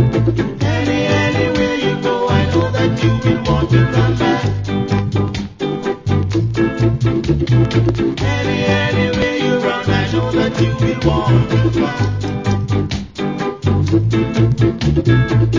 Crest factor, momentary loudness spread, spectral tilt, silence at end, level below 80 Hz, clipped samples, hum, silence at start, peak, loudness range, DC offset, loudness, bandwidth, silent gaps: 14 dB; 6 LU; -7 dB/octave; 0 s; -30 dBFS; under 0.1%; none; 0 s; 0 dBFS; 2 LU; under 0.1%; -16 LUFS; 7.6 kHz; none